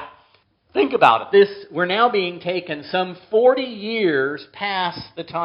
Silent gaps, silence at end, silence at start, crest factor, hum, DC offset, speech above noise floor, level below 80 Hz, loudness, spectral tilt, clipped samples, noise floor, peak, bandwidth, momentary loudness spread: none; 0 s; 0 s; 20 dB; none; under 0.1%; 40 dB; -66 dBFS; -19 LUFS; -2.5 dB/octave; under 0.1%; -59 dBFS; 0 dBFS; 5.6 kHz; 11 LU